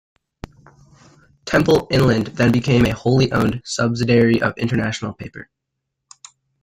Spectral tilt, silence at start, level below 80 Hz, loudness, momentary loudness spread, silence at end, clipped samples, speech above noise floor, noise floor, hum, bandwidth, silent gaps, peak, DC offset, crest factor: -6 dB/octave; 1.45 s; -42 dBFS; -17 LUFS; 14 LU; 1.2 s; under 0.1%; 61 dB; -78 dBFS; none; 15.5 kHz; none; -4 dBFS; under 0.1%; 16 dB